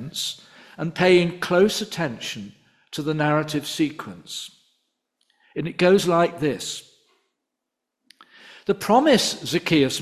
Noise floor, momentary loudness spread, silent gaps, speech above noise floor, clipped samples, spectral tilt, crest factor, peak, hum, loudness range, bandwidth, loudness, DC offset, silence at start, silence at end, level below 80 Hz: -83 dBFS; 18 LU; none; 61 dB; under 0.1%; -4.5 dB/octave; 18 dB; -4 dBFS; none; 5 LU; 15 kHz; -22 LUFS; under 0.1%; 0 s; 0 s; -60 dBFS